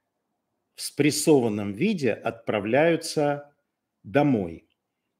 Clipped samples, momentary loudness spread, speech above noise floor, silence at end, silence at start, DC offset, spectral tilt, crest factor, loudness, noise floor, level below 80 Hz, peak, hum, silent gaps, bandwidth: under 0.1%; 11 LU; 55 dB; 0.6 s; 0.8 s; under 0.1%; -5 dB/octave; 20 dB; -24 LUFS; -79 dBFS; -66 dBFS; -6 dBFS; none; none; 16 kHz